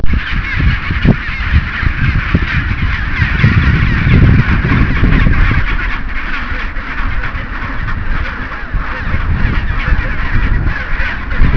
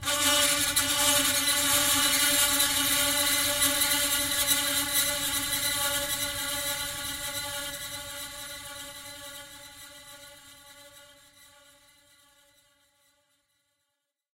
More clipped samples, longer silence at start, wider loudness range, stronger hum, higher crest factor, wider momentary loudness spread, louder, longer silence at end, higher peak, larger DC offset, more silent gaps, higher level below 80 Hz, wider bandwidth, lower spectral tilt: first, 0.3% vs under 0.1%; about the same, 0 s vs 0 s; second, 8 LU vs 20 LU; neither; second, 12 dB vs 20 dB; second, 10 LU vs 19 LU; first, -15 LUFS vs -24 LUFS; second, 0 s vs 3.35 s; first, 0 dBFS vs -10 dBFS; neither; neither; first, -14 dBFS vs -54 dBFS; second, 5.4 kHz vs 16 kHz; first, -8 dB/octave vs 0 dB/octave